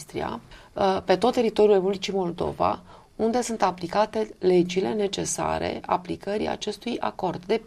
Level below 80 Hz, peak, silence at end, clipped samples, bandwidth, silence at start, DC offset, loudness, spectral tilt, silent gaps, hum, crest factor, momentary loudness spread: -52 dBFS; -8 dBFS; 0.05 s; under 0.1%; 14 kHz; 0 s; under 0.1%; -25 LUFS; -5 dB/octave; none; none; 18 dB; 9 LU